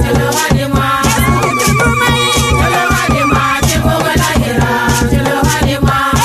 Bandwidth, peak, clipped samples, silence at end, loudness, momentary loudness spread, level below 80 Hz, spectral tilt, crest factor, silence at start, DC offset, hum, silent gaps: 15.5 kHz; 0 dBFS; under 0.1%; 0 s; -11 LUFS; 2 LU; -22 dBFS; -4.5 dB/octave; 10 dB; 0 s; under 0.1%; none; none